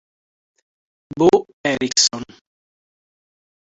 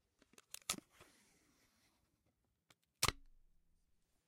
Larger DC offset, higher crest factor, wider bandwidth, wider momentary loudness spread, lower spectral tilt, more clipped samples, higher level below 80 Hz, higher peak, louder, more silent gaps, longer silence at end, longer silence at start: neither; second, 20 dB vs 34 dB; second, 8.4 kHz vs 16 kHz; first, 20 LU vs 17 LU; about the same, -2.5 dB/octave vs -1.5 dB/octave; neither; first, -58 dBFS vs -66 dBFS; first, -2 dBFS vs -16 dBFS; first, -17 LUFS vs -42 LUFS; first, 1.53-1.64 s vs none; first, 1.45 s vs 1.05 s; first, 1.15 s vs 0.7 s